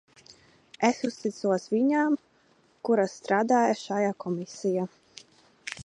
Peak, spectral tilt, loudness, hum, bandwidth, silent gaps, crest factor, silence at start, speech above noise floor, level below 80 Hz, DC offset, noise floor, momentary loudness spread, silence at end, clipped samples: -10 dBFS; -5.5 dB/octave; -27 LUFS; none; 10.5 kHz; none; 18 dB; 0.8 s; 38 dB; -72 dBFS; under 0.1%; -64 dBFS; 10 LU; 0.05 s; under 0.1%